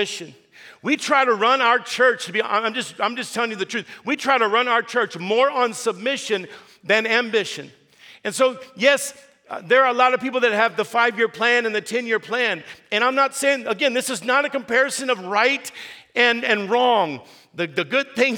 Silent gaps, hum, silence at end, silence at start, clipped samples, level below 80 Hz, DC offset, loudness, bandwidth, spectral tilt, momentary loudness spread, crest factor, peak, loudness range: none; none; 0 s; 0 s; under 0.1%; -78 dBFS; under 0.1%; -20 LUFS; 19 kHz; -2.5 dB/octave; 11 LU; 20 dB; -2 dBFS; 3 LU